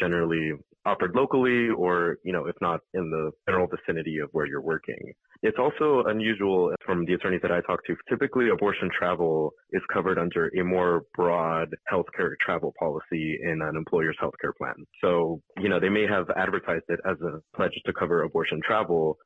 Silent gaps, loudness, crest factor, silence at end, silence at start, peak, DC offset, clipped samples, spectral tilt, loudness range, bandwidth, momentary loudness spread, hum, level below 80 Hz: none; -26 LUFS; 14 dB; 0.1 s; 0 s; -12 dBFS; under 0.1%; under 0.1%; -8 dB/octave; 3 LU; 4.1 kHz; 7 LU; none; -58 dBFS